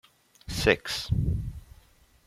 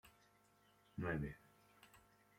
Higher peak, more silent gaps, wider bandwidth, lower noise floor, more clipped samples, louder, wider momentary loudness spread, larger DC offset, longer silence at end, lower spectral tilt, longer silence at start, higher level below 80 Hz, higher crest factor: first, -6 dBFS vs -32 dBFS; neither; about the same, 15.5 kHz vs 16.5 kHz; second, -59 dBFS vs -74 dBFS; neither; first, -28 LUFS vs -46 LUFS; second, 21 LU vs 24 LU; neither; first, 0.65 s vs 0.4 s; second, -5 dB/octave vs -7.5 dB/octave; first, 0.5 s vs 0.05 s; first, -40 dBFS vs -66 dBFS; about the same, 24 dB vs 20 dB